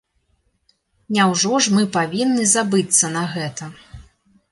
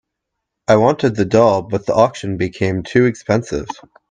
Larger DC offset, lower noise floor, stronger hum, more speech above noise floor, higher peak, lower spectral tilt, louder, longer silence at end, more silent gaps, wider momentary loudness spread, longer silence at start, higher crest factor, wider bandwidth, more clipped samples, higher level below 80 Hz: neither; second, -66 dBFS vs -78 dBFS; neither; second, 47 dB vs 62 dB; about the same, -2 dBFS vs 0 dBFS; second, -3 dB/octave vs -6.5 dB/octave; about the same, -17 LUFS vs -16 LUFS; first, 0.5 s vs 0.35 s; neither; about the same, 12 LU vs 12 LU; first, 1.1 s vs 0.7 s; about the same, 18 dB vs 16 dB; first, 11.5 kHz vs 9.6 kHz; neither; second, -54 dBFS vs -48 dBFS